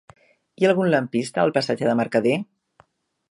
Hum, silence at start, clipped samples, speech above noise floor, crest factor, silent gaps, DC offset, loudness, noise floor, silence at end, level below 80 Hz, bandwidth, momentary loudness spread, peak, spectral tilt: none; 0.6 s; under 0.1%; 39 dB; 20 dB; none; under 0.1%; -21 LUFS; -59 dBFS; 0.9 s; -68 dBFS; 11.5 kHz; 6 LU; -4 dBFS; -6 dB/octave